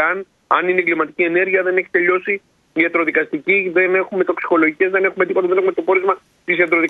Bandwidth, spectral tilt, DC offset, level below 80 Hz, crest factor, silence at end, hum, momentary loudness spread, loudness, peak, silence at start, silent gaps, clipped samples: 4.1 kHz; -7.5 dB/octave; under 0.1%; -68 dBFS; 16 dB; 0 s; none; 5 LU; -17 LUFS; 0 dBFS; 0 s; none; under 0.1%